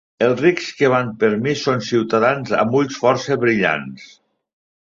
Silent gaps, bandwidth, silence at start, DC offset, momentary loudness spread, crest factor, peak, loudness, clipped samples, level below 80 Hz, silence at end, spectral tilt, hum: none; 7.6 kHz; 0.2 s; under 0.1%; 3 LU; 16 dB; -2 dBFS; -18 LUFS; under 0.1%; -58 dBFS; 0.9 s; -5.5 dB/octave; none